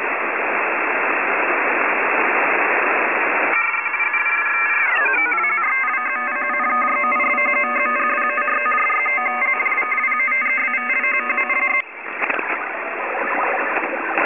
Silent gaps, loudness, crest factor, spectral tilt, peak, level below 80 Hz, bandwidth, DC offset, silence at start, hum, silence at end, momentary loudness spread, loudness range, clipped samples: none; -17 LUFS; 18 dB; -5.5 dB/octave; -2 dBFS; -70 dBFS; 3.7 kHz; 0.2%; 0 s; none; 0 s; 5 LU; 2 LU; under 0.1%